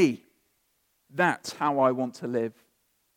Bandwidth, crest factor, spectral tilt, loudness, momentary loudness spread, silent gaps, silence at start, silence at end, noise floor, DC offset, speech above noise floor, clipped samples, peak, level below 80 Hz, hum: 16.5 kHz; 20 dB; -5.5 dB/octave; -27 LUFS; 12 LU; none; 0 s; 0.65 s; -72 dBFS; under 0.1%; 46 dB; under 0.1%; -10 dBFS; -80 dBFS; none